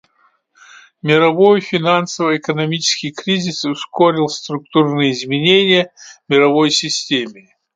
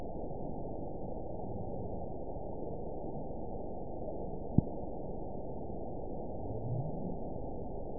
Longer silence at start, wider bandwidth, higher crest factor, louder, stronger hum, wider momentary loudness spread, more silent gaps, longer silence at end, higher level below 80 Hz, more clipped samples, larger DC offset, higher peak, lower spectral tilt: first, 1.05 s vs 0 s; first, 9.4 kHz vs 1 kHz; second, 16 dB vs 30 dB; first, -15 LUFS vs -41 LUFS; neither; first, 9 LU vs 6 LU; neither; first, 0.45 s vs 0 s; second, -64 dBFS vs -48 dBFS; neither; second, under 0.1% vs 0.8%; first, 0 dBFS vs -10 dBFS; about the same, -4 dB/octave vs -5 dB/octave